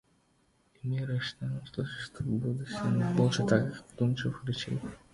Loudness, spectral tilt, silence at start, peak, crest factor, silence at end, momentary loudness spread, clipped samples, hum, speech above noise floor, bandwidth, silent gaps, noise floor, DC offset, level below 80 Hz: -32 LUFS; -6.5 dB/octave; 0.85 s; -10 dBFS; 22 dB; 0.15 s; 10 LU; under 0.1%; none; 38 dB; 11.5 kHz; none; -69 dBFS; under 0.1%; -58 dBFS